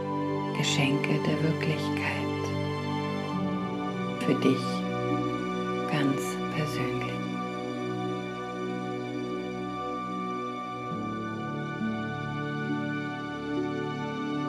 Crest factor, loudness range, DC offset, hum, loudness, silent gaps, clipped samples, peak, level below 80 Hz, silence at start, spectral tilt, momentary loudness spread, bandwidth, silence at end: 18 dB; 5 LU; under 0.1%; none; -30 LUFS; none; under 0.1%; -12 dBFS; -62 dBFS; 0 s; -6 dB/octave; 8 LU; 14 kHz; 0 s